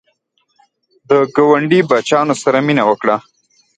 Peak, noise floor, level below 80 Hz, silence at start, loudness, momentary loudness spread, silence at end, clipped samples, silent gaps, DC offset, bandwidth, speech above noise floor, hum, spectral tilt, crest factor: 0 dBFS; -63 dBFS; -60 dBFS; 1.1 s; -13 LUFS; 4 LU; 0.6 s; under 0.1%; none; under 0.1%; 9.4 kHz; 50 dB; none; -5.5 dB/octave; 14 dB